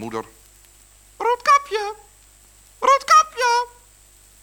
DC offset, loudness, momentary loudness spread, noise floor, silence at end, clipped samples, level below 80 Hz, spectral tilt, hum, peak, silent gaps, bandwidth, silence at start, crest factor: under 0.1%; -18 LUFS; 17 LU; -51 dBFS; 0.75 s; under 0.1%; -56 dBFS; -1 dB/octave; 50 Hz at -55 dBFS; -2 dBFS; none; over 20 kHz; 0 s; 20 dB